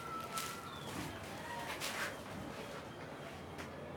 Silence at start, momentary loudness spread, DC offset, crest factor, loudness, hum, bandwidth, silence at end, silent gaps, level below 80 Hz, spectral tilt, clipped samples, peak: 0 s; 8 LU; under 0.1%; 26 dB; -44 LUFS; none; over 20 kHz; 0 s; none; -66 dBFS; -3.5 dB/octave; under 0.1%; -20 dBFS